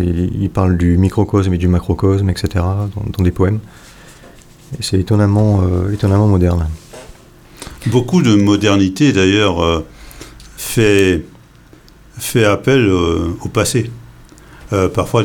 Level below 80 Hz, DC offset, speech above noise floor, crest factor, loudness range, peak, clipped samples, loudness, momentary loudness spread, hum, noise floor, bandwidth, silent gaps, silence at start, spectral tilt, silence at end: -32 dBFS; under 0.1%; 29 dB; 14 dB; 3 LU; 0 dBFS; under 0.1%; -14 LUFS; 12 LU; none; -43 dBFS; 17.5 kHz; none; 0 s; -6 dB/octave; 0 s